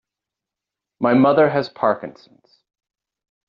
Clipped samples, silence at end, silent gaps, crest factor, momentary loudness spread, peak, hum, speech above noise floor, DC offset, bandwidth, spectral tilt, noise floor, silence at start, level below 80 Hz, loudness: under 0.1%; 1.4 s; none; 18 dB; 12 LU; -4 dBFS; none; 68 dB; under 0.1%; 5.6 kHz; -5.5 dB/octave; -86 dBFS; 1 s; -66 dBFS; -18 LUFS